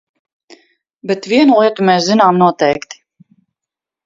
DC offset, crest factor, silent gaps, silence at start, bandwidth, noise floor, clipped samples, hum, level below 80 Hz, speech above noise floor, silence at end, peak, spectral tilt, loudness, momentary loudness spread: under 0.1%; 14 dB; none; 1.05 s; 7.8 kHz; -85 dBFS; under 0.1%; none; -60 dBFS; 73 dB; 1.1 s; 0 dBFS; -5.5 dB/octave; -12 LUFS; 12 LU